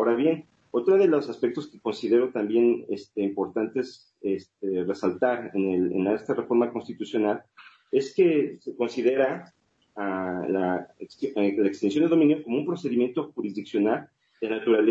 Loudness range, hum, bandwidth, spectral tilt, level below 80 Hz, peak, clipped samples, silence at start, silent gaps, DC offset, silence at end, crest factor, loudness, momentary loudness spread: 3 LU; none; 7.8 kHz; -7 dB/octave; -74 dBFS; -10 dBFS; under 0.1%; 0 s; none; under 0.1%; 0 s; 16 dB; -26 LUFS; 10 LU